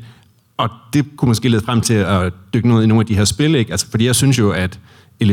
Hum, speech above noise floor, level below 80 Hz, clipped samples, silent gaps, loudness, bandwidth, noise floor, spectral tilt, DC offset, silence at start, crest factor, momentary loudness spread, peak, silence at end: none; 32 dB; -42 dBFS; under 0.1%; none; -16 LUFS; 16.5 kHz; -47 dBFS; -5.5 dB/octave; under 0.1%; 0 s; 12 dB; 9 LU; -4 dBFS; 0 s